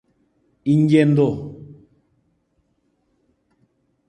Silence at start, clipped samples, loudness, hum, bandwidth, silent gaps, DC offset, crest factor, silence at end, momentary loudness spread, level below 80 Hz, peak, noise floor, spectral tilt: 0.65 s; under 0.1%; -18 LUFS; none; 9.2 kHz; none; under 0.1%; 20 dB; 2.35 s; 21 LU; -58 dBFS; -2 dBFS; -67 dBFS; -8.5 dB/octave